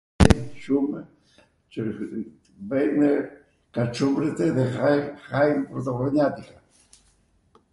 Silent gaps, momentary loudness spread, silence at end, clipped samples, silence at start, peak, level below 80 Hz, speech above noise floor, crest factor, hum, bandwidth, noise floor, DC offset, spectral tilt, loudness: none; 15 LU; 1.3 s; under 0.1%; 0.2 s; 0 dBFS; -36 dBFS; 39 dB; 24 dB; none; 11.5 kHz; -63 dBFS; under 0.1%; -7 dB/octave; -24 LUFS